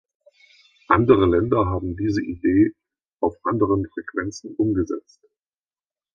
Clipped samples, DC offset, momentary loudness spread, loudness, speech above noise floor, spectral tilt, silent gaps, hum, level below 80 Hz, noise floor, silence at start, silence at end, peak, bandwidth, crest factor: under 0.1%; under 0.1%; 12 LU; -21 LUFS; over 69 dB; -8 dB/octave; 3.12-3.17 s; none; -42 dBFS; under -90 dBFS; 0.9 s; 1.15 s; 0 dBFS; 7.4 kHz; 22 dB